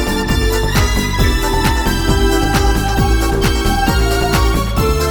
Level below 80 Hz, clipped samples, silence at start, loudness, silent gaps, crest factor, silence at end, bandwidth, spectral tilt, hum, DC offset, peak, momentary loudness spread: -16 dBFS; under 0.1%; 0 s; -15 LUFS; none; 12 dB; 0 s; 19 kHz; -5 dB/octave; none; under 0.1%; 0 dBFS; 2 LU